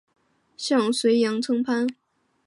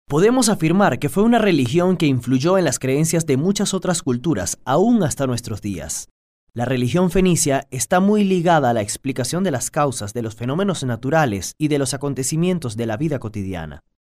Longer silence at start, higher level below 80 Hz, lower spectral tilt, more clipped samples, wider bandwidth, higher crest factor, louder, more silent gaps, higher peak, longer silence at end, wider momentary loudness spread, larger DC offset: first, 0.6 s vs 0.1 s; second, -78 dBFS vs -44 dBFS; about the same, -4 dB/octave vs -5 dB/octave; neither; second, 11.5 kHz vs 16 kHz; about the same, 14 dB vs 16 dB; second, -23 LUFS vs -19 LUFS; second, none vs 6.11-6.47 s; second, -10 dBFS vs -4 dBFS; first, 0.55 s vs 0.2 s; second, 7 LU vs 10 LU; neither